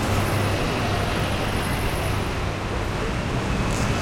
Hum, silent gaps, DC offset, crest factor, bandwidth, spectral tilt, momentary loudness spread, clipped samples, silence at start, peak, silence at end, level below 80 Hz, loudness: none; none; under 0.1%; 14 dB; 16.5 kHz; -5 dB/octave; 4 LU; under 0.1%; 0 s; -10 dBFS; 0 s; -32 dBFS; -24 LUFS